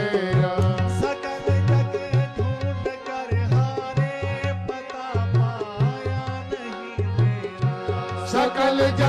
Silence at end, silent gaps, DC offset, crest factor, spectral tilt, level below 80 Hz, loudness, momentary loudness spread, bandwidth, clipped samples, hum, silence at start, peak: 0 s; none; under 0.1%; 10 dB; -7 dB/octave; -46 dBFS; -24 LUFS; 9 LU; 10 kHz; under 0.1%; none; 0 s; -12 dBFS